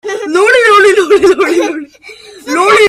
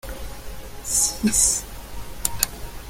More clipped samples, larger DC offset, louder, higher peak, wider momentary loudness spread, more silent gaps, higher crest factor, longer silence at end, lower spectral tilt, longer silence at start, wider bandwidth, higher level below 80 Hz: first, 0.1% vs under 0.1%; neither; first, -8 LUFS vs -21 LUFS; about the same, 0 dBFS vs 0 dBFS; second, 12 LU vs 21 LU; neither; second, 8 dB vs 26 dB; about the same, 0 s vs 0 s; about the same, -2.5 dB/octave vs -2 dB/octave; about the same, 0.05 s vs 0.05 s; second, 13.5 kHz vs 17 kHz; second, -48 dBFS vs -38 dBFS